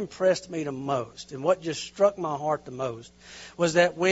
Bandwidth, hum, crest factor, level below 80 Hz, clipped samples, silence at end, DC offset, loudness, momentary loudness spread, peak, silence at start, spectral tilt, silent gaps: 8 kHz; none; 20 dB; -62 dBFS; under 0.1%; 0 s; under 0.1%; -27 LUFS; 17 LU; -6 dBFS; 0 s; -4.5 dB/octave; none